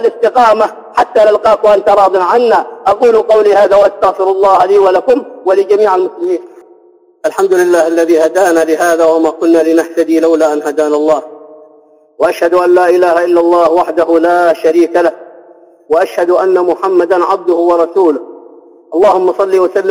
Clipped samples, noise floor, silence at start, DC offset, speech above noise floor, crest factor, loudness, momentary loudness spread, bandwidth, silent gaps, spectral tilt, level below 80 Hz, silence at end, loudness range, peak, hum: under 0.1%; -45 dBFS; 0 s; under 0.1%; 36 dB; 10 dB; -10 LUFS; 5 LU; 15.5 kHz; none; -4.5 dB/octave; -52 dBFS; 0 s; 3 LU; 0 dBFS; none